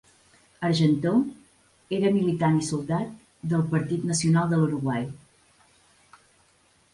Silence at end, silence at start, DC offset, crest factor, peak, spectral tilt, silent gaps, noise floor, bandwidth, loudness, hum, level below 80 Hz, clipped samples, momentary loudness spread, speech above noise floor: 1.75 s; 0.6 s; under 0.1%; 16 dB; -10 dBFS; -6 dB/octave; none; -63 dBFS; 11.5 kHz; -25 LUFS; none; -60 dBFS; under 0.1%; 10 LU; 39 dB